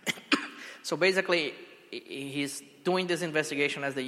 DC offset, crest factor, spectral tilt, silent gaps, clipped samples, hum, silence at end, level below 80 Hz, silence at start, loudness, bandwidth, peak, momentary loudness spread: under 0.1%; 22 dB; -3.5 dB/octave; none; under 0.1%; none; 0 s; -80 dBFS; 0.05 s; -29 LUFS; 16 kHz; -10 dBFS; 15 LU